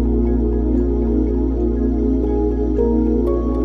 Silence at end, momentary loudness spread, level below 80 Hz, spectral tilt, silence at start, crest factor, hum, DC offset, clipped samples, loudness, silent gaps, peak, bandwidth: 0 s; 2 LU; -20 dBFS; -11.5 dB/octave; 0 s; 12 dB; none; under 0.1%; under 0.1%; -18 LUFS; none; -6 dBFS; 2.3 kHz